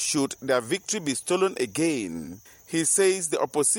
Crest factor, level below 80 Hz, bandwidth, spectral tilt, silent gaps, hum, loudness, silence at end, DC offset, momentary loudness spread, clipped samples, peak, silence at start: 16 dB; -66 dBFS; 17 kHz; -3 dB/octave; none; none; -25 LUFS; 0 s; under 0.1%; 12 LU; under 0.1%; -10 dBFS; 0 s